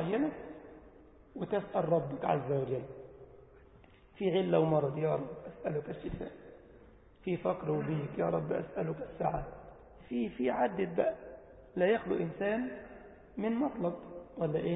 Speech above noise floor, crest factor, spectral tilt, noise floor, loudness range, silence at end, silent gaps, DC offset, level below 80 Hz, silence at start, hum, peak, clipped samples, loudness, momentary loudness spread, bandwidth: 26 dB; 20 dB; -5 dB/octave; -59 dBFS; 3 LU; 0 s; none; under 0.1%; -60 dBFS; 0 s; none; -16 dBFS; under 0.1%; -34 LUFS; 20 LU; 3.9 kHz